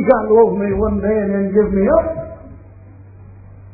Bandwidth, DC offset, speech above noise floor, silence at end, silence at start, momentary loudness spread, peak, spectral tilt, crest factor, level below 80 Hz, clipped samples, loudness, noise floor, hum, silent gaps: 2.6 kHz; under 0.1%; 25 dB; 0.05 s; 0 s; 15 LU; 0 dBFS; -13.5 dB/octave; 16 dB; -34 dBFS; under 0.1%; -15 LUFS; -39 dBFS; none; none